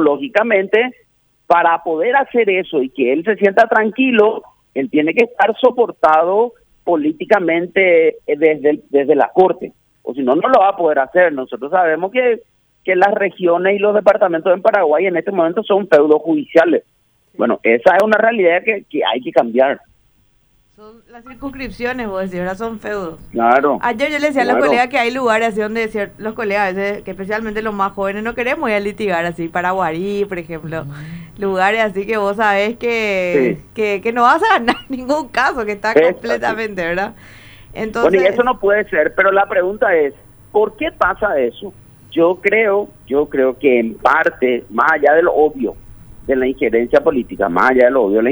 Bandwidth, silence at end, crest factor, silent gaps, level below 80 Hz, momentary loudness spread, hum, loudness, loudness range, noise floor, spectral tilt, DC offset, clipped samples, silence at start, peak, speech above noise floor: over 20 kHz; 0 s; 14 dB; none; -48 dBFS; 11 LU; none; -15 LUFS; 5 LU; -56 dBFS; -6 dB/octave; under 0.1%; under 0.1%; 0 s; 0 dBFS; 41 dB